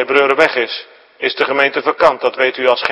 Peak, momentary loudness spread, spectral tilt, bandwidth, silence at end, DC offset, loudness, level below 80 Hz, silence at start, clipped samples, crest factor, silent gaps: 0 dBFS; 9 LU; -3.5 dB/octave; 11 kHz; 0 s; under 0.1%; -14 LUFS; -56 dBFS; 0 s; 0.2%; 14 dB; none